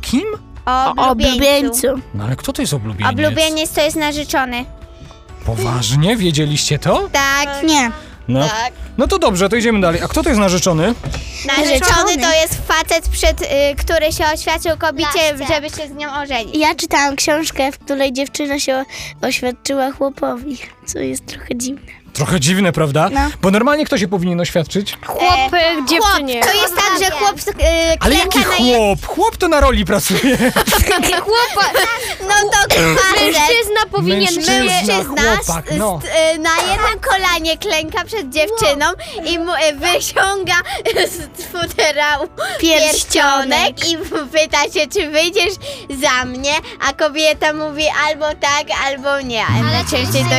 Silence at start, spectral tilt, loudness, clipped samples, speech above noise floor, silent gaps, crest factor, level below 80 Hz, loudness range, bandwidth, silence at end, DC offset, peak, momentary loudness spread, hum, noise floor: 0 s; -3.5 dB/octave; -14 LUFS; under 0.1%; 21 dB; none; 14 dB; -30 dBFS; 5 LU; 16.5 kHz; 0 s; under 0.1%; 0 dBFS; 9 LU; none; -36 dBFS